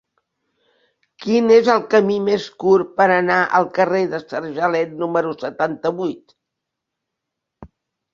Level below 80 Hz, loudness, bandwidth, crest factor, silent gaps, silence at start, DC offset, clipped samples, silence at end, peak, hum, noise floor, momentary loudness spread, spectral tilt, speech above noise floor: -60 dBFS; -18 LUFS; 7.4 kHz; 18 dB; none; 1.2 s; under 0.1%; under 0.1%; 0.45 s; 0 dBFS; none; -81 dBFS; 12 LU; -6 dB/octave; 63 dB